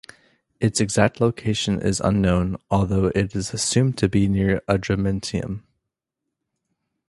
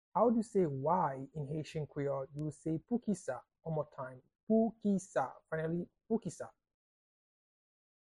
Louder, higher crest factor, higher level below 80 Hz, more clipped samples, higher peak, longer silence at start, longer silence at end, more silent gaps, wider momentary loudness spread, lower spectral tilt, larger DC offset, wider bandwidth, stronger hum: first, -22 LUFS vs -37 LUFS; about the same, 20 dB vs 18 dB; first, -40 dBFS vs -70 dBFS; neither; first, -2 dBFS vs -18 dBFS; first, 0.6 s vs 0.15 s; about the same, 1.5 s vs 1.6 s; second, none vs 4.43-4.47 s; second, 6 LU vs 13 LU; second, -5.5 dB/octave vs -7.5 dB/octave; neither; about the same, 11.5 kHz vs 11 kHz; neither